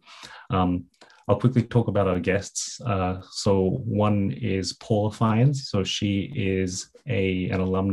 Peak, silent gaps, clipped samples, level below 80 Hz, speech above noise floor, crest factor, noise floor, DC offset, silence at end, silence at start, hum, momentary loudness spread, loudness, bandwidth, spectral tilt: -6 dBFS; none; under 0.1%; -44 dBFS; 22 dB; 18 dB; -45 dBFS; under 0.1%; 0 s; 0.1 s; none; 7 LU; -25 LUFS; 12 kHz; -6 dB/octave